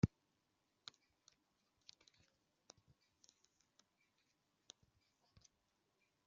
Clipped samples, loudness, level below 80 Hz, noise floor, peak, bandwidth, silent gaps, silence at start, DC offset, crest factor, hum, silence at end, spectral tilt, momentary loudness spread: under 0.1%; -49 LUFS; -70 dBFS; -85 dBFS; -20 dBFS; 7.4 kHz; none; 0.05 s; under 0.1%; 32 dB; none; 6.2 s; -7.5 dB/octave; 11 LU